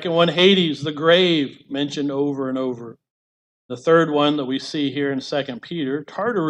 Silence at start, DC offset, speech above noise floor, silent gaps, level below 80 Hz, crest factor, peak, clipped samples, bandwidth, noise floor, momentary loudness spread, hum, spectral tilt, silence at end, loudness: 0 s; under 0.1%; over 70 dB; 3.10-3.69 s; -68 dBFS; 18 dB; -4 dBFS; under 0.1%; 9.8 kHz; under -90 dBFS; 12 LU; none; -5.5 dB/octave; 0 s; -20 LUFS